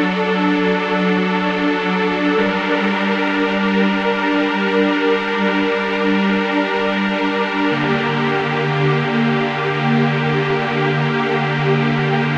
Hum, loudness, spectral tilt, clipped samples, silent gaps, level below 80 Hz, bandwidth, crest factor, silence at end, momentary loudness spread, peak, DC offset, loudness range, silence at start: none; -17 LUFS; -7 dB/octave; under 0.1%; none; -54 dBFS; 8.2 kHz; 14 dB; 0 s; 2 LU; -4 dBFS; under 0.1%; 1 LU; 0 s